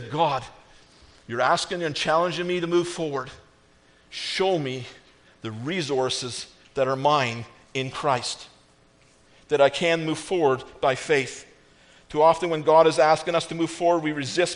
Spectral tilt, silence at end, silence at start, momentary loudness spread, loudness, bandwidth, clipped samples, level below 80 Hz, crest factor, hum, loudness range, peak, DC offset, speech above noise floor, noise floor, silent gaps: -4.5 dB/octave; 0 s; 0 s; 14 LU; -24 LUFS; 10.5 kHz; under 0.1%; -60 dBFS; 20 dB; none; 7 LU; -4 dBFS; under 0.1%; 34 dB; -58 dBFS; none